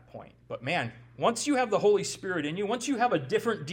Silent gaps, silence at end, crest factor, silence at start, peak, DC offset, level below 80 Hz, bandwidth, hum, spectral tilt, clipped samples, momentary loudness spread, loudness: none; 0 s; 18 dB; 0.15 s; -12 dBFS; under 0.1%; -66 dBFS; 16.5 kHz; none; -4 dB/octave; under 0.1%; 13 LU; -28 LUFS